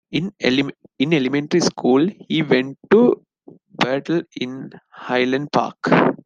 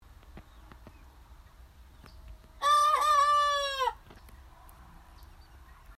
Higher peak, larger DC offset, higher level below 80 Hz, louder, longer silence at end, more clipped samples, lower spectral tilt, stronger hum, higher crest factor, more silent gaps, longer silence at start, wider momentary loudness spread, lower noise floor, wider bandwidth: first, -2 dBFS vs -16 dBFS; neither; second, -62 dBFS vs -54 dBFS; first, -19 LUFS vs -26 LUFS; about the same, 0.1 s vs 0.05 s; neither; first, -5.5 dB/octave vs -1 dB/octave; neither; about the same, 18 dB vs 16 dB; neither; second, 0.1 s vs 0.3 s; first, 12 LU vs 9 LU; second, -47 dBFS vs -54 dBFS; second, 9.4 kHz vs 15 kHz